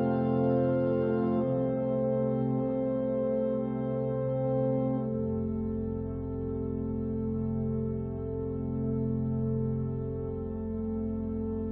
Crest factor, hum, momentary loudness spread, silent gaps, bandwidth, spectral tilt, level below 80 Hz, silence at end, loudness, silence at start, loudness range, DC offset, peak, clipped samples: 14 dB; none; 7 LU; none; 3.7 kHz; -13.5 dB/octave; -46 dBFS; 0 s; -31 LUFS; 0 s; 4 LU; under 0.1%; -16 dBFS; under 0.1%